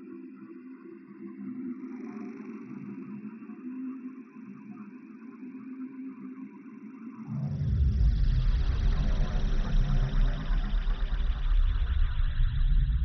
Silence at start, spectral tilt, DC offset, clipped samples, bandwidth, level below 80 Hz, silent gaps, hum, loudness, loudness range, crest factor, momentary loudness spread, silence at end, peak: 0 s; -7 dB/octave; under 0.1%; under 0.1%; 6 kHz; -30 dBFS; none; none; -33 LUFS; 12 LU; 12 dB; 17 LU; 0 s; -16 dBFS